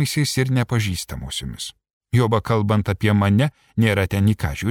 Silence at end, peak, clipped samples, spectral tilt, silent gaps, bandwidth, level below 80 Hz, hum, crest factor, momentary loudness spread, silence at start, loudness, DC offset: 0 s; -6 dBFS; under 0.1%; -6 dB/octave; 1.93-2.01 s; 17.5 kHz; -42 dBFS; none; 14 dB; 10 LU; 0 s; -20 LUFS; under 0.1%